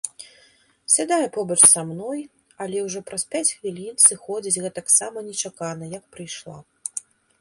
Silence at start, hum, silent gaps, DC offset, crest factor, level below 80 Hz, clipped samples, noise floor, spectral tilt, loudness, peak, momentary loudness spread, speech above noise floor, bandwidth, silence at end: 0.05 s; none; none; under 0.1%; 24 dB; -68 dBFS; under 0.1%; -57 dBFS; -2 dB/octave; -19 LUFS; 0 dBFS; 21 LU; 35 dB; 12 kHz; 0.4 s